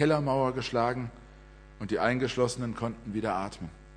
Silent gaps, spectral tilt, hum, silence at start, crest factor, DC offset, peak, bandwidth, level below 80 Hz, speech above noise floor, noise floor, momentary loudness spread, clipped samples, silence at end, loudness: none; -6 dB/octave; none; 0 s; 20 dB; under 0.1%; -10 dBFS; 10.5 kHz; -52 dBFS; 22 dB; -51 dBFS; 12 LU; under 0.1%; 0 s; -30 LUFS